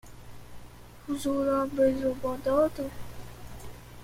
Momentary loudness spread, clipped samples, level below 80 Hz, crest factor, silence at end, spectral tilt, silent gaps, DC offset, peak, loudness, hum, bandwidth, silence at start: 24 LU; under 0.1%; -50 dBFS; 18 dB; 0 s; -6 dB/octave; none; under 0.1%; -12 dBFS; -28 LUFS; 60 Hz at -50 dBFS; 16.5 kHz; 0.05 s